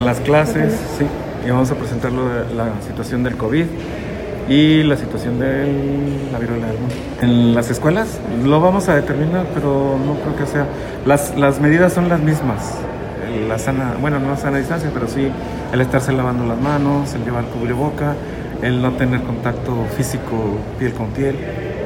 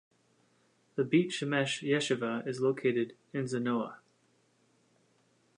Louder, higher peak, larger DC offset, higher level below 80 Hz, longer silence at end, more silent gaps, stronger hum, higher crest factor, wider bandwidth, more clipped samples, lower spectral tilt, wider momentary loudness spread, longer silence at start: first, -18 LUFS vs -32 LUFS; first, 0 dBFS vs -14 dBFS; neither; first, -34 dBFS vs -82 dBFS; second, 0 s vs 1.6 s; neither; neither; about the same, 16 dB vs 20 dB; first, 17 kHz vs 11 kHz; neither; first, -6.5 dB/octave vs -5 dB/octave; about the same, 9 LU vs 8 LU; second, 0 s vs 0.95 s